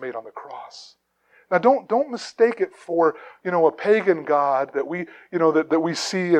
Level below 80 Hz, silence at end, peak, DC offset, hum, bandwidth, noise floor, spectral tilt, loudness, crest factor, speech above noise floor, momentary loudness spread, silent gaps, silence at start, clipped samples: -78 dBFS; 0 s; -4 dBFS; under 0.1%; none; 10.5 kHz; -60 dBFS; -5 dB/octave; -21 LUFS; 18 dB; 39 dB; 15 LU; none; 0 s; under 0.1%